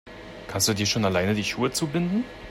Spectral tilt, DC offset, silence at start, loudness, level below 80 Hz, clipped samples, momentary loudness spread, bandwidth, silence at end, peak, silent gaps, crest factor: -4 dB/octave; under 0.1%; 0.05 s; -25 LUFS; -52 dBFS; under 0.1%; 11 LU; 16 kHz; 0 s; -8 dBFS; none; 18 dB